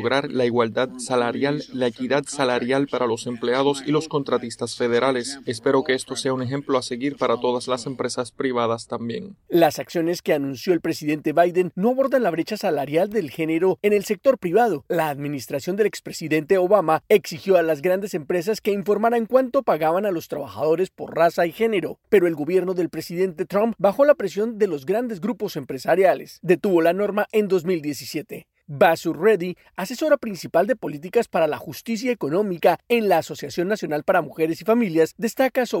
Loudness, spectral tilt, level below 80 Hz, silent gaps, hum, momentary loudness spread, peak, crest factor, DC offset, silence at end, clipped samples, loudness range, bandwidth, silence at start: -22 LUFS; -5.5 dB/octave; -64 dBFS; none; none; 8 LU; -4 dBFS; 18 dB; under 0.1%; 0 s; under 0.1%; 2 LU; 17 kHz; 0 s